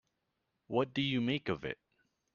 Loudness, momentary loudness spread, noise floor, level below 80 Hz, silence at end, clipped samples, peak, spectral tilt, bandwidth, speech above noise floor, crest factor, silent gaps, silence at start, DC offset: -35 LUFS; 10 LU; -84 dBFS; -70 dBFS; 0.6 s; under 0.1%; -18 dBFS; -4 dB/octave; 7 kHz; 49 dB; 20 dB; none; 0.7 s; under 0.1%